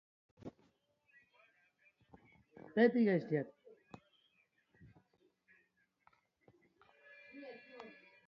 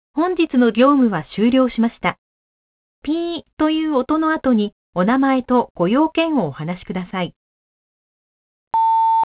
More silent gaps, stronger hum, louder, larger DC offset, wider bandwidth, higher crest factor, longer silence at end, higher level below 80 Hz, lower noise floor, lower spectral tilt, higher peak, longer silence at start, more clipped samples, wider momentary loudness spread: second, none vs 2.18-3.02 s, 3.53-3.57 s, 4.72-4.93 s, 5.70-5.75 s, 7.36-8.71 s; neither; second, -34 LUFS vs -18 LUFS; neither; first, 5.8 kHz vs 4 kHz; first, 24 dB vs 18 dB; first, 0.4 s vs 0.1 s; second, -82 dBFS vs -52 dBFS; second, -78 dBFS vs under -90 dBFS; second, -6.5 dB/octave vs -10.5 dB/octave; second, -18 dBFS vs -2 dBFS; first, 0.45 s vs 0.15 s; neither; first, 29 LU vs 11 LU